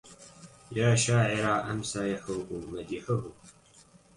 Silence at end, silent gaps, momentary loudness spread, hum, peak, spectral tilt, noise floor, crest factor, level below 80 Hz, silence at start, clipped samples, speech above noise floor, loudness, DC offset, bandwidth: 0.65 s; none; 21 LU; none; -12 dBFS; -5 dB/octave; -58 dBFS; 18 dB; -58 dBFS; 0.05 s; under 0.1%; 29 dB; -29 LUFS; under 0.1%; 11.5 kHz